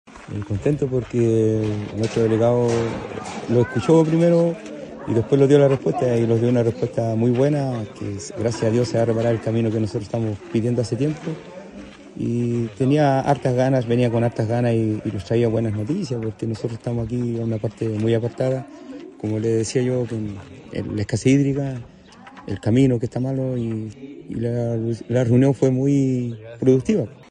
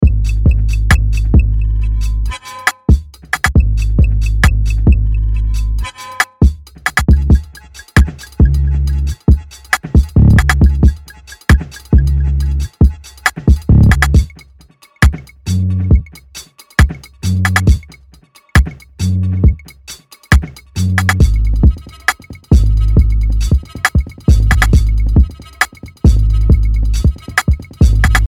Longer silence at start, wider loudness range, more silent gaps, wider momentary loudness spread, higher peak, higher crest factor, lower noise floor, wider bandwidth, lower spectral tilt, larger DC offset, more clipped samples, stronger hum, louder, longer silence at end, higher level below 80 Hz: about the same, 0.1 s vs 0 s; about the same, 5 LU vs 3 LU; neither; first, 13 LU vs 8 LU; about the same, -2 dBFS vs 0 dBFS; first, 18 dB vs 12 dB; about the same, -43 dBFS vs -45 dBFS; second, 9.8 kHz vs 15.5 kHz; first, -7.5 dB/octave vs -6 dB/octave; neither; neither; neither; second, -21 LUFS vs -14 LUFS; about the same, 0.05 s vs 0 s; second, -52 dBFS vs -14 dBFS